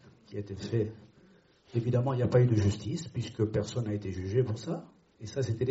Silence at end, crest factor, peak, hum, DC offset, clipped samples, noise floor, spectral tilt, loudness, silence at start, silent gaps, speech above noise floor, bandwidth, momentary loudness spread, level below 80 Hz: 0 s; 18 dB; -14 dBFS; none; under 0.1%; under 0.1%; -61 dBFS; -8 dB/octave; -31 LUFS; 0.05 s; none; 31 dB; 8 kHz; 14 LU; -58 dBFS